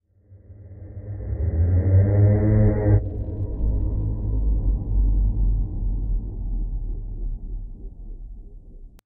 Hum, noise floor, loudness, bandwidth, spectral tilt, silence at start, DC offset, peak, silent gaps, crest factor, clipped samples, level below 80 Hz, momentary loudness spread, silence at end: none; -50 dBFS; -23 LUFS; 2.2 kHz; -13.5 dB/octave; 0.3 s; under 0.1%; -6 dBFS; none; 16 dB; under 0.1%; -26 dBFS; 23 LU; 0.15 s